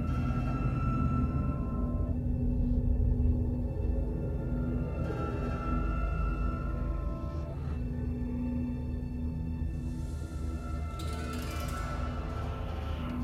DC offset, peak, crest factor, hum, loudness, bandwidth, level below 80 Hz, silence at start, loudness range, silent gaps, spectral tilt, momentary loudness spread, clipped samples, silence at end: under 0.1%; -16 dBFS; 16 dB; none; -34 LUFS; 13 kHz; -34 dBFS; 0 s; 5 LU; none; -8 dB/octave; 7 LU; under 0.1%; 0 s